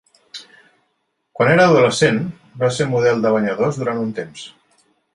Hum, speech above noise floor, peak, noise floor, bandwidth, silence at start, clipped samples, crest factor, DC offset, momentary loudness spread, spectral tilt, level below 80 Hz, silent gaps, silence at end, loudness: none; 54 dB; -2 dBFS; -70 dBFS; 11.5 kHz; 0.35 s; under 0.1%; 16 dB; under 0.1%; 24 LU; -5.5 dB/octave; -58 dBFS; none; 0.65 s; -17 LUFS